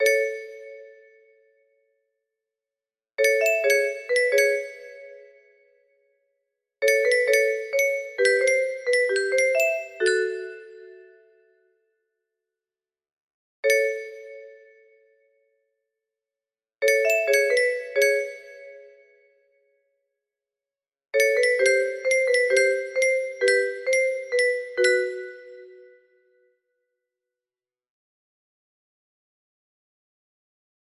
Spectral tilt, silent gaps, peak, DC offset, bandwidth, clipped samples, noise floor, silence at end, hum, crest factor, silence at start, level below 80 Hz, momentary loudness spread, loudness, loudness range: 0 dB/octave; 13.13-13.28 s, 13.34-13.63 s; -8 dBFS; under 0.1%; 14.5 kHz; under 0.1%; under -90 dBFS; 5.3 s; none; 18 dB; 0 s; -76 dBFS; 19 LU; -22 LUFS; 8 LU